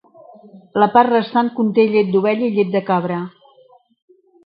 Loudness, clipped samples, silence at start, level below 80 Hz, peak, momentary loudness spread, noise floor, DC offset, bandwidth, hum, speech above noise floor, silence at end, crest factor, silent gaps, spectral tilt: -17 LUFS; under 0.1%; 0.55 s; -66 dBFS; 0 dBFS; 11 LU; -51 dBFS; under 0.1%; 5.2 kHz; none; 35 dB; 1.15 s; 18 dB; none; -10.5 dB/octave